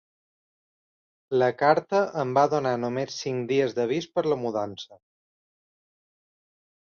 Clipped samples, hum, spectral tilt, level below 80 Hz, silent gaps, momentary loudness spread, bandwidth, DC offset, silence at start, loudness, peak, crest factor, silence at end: under 0.1%; none; -5.5 dB/octave; -70 dBFS; none; 9 LU; 7 kHz; under 0.1%; 1.3 s; -25 LUFS; -6 dBFS; 20 dB; 1.9 s